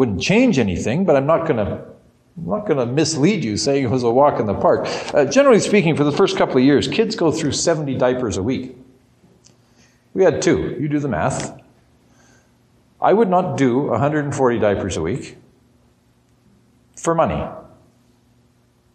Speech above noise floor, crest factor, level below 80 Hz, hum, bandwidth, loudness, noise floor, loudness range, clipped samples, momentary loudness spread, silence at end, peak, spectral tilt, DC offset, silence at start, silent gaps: 40 dB; 16 dB; -48 dBFS; none; 10 kHz; -18 LUFS; -57 dBFS; 7 LU; under 0.1%; 11 LU; 1.3 s; -4 dBFS; -5.5 dB/octave; under 0.1%; 0 s; none